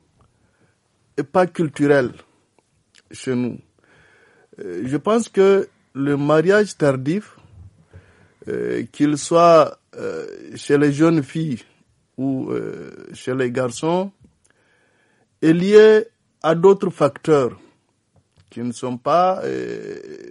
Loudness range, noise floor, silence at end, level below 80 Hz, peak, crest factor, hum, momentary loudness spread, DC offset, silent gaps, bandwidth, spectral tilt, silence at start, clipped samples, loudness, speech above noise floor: 8 LU; -63 dBFS; 0 s; -62 dBFS; 0 dBFS; 18 dB; none; 18 LU; under 0.1%; none; 11.5 kHz; -6.5 dB/octave; 1.15 s; under 0.1%; -18 LUFS; 45 dB